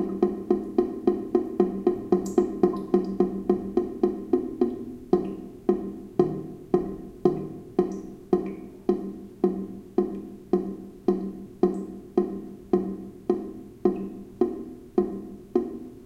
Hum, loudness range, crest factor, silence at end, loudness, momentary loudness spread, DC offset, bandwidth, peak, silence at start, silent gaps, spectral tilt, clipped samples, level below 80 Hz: none; 4 LU; 22 dB; 0 s; -28 LUFS; 11 LU; under 0.1%; 8.4 kHz; -4 dBFS; 0 s; none; -9 dB/octave; under 0.1%; -54 dBFS